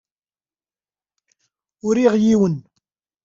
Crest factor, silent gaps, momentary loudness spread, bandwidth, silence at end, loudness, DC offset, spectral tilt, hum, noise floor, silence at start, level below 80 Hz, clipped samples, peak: 18 dB; none; 14 LU; 7.8 kHz; 0.65 s; -18 LUFS; under 0.1%; -7 dB/octave; none; under -90 dBFS; 1.85 s; -60 dBFS; under 0.1%; -4 dBFS